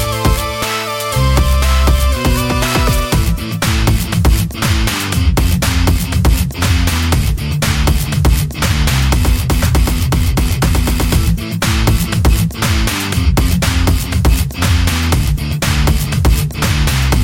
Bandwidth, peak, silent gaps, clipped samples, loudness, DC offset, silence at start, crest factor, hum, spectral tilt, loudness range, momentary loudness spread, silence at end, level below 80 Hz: 17 kHz; 0 dBFS; none; under 0.1%; -14 LUFS; under 0.1%; 0 s; 12 dB; none; -4.5 dB/octave; 0 LU; 2 LU; 0 s; -16 dBFS